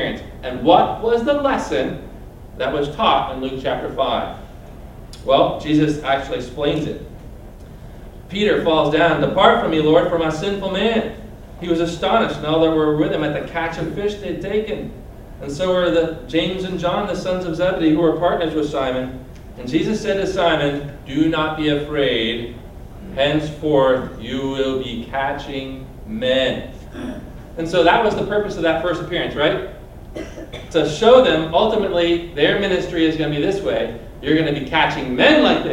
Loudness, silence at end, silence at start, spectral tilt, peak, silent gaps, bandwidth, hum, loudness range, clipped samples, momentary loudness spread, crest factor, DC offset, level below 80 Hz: -18 LUFS; 0 s; 0 s; -6 dB/octave; 0 dBFS; none; 15.5 kHz; none; 5 LU; under 0.1%; 19 LU; 18 dB; under 0.1%; -38 dBFS